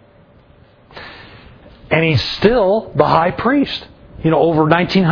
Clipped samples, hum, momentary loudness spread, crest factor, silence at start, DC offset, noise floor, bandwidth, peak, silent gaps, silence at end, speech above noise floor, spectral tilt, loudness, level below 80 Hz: under 0.1%; none; 18 LU; 16 dB; 0.95 s; under 0.1%; -47 dBFS; 5.4 kHz; 0 dBFS; none; 0 s; 34 dB; -7.5 dB/octave; -15 LUFS; -40 dBFS